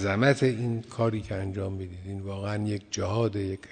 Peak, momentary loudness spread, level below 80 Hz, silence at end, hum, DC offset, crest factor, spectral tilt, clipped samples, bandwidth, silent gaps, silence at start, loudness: -8 dBFS; 12 LU; -56 dBFS; 0 s; none; under 0.1%; 20 dB; -6 dB/octave; under 0.1%; 9.4 kHz; none; 0 s; -29 LUFS